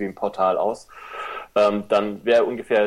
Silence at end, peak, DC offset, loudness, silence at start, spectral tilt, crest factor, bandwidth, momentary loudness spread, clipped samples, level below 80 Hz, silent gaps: 0 s; -6 dBFS; under 0.1%; -22 LUFS; 0 s; -5.5 dB/octave; 16 dB; 12 kHz; 14 LU; under 0.1%; -60 dBFS; none